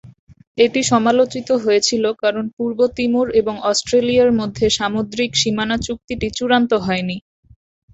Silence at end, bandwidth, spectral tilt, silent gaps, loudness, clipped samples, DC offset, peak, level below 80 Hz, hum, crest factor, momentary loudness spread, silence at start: 0.75 s; 8.2 kHz; -4 dB/octave; 0.19-0.27 s, 0.47-0.55 s, 2.53-2.57 s, 6.04-6.08 s; -17 LUFS; under 0.1%; under 0.1%; -2 dBFS; -46 dBFS; none; 16 dB; 8 LU; 0.05 s